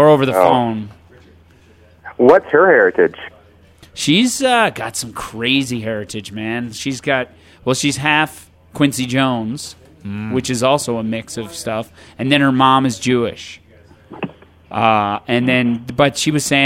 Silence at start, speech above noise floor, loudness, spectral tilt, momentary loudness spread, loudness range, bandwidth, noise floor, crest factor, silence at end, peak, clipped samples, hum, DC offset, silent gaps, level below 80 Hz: 0 s; 32 dB; -16 LUFS; -4.5 dB/octave; 18 LU; 5 LU; 16.5 kHz; -48 dBFS; 16 dB; 0 s; 0 dBFS; under 0.1%; none; under 0.1%; none; -52 dBFS